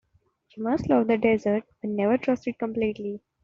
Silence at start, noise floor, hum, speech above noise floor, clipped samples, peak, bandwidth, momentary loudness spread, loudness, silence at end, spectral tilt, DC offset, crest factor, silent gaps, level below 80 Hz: 0.55 s; -66 dBFS; none; 41 dB; under 0.1%; -8 dBFS; 7.2 kHz; 10 LU; -26 LUFS; 0.25 s; -6 dB/octave; under 0.1%; 18 dB; none; -56 dBFS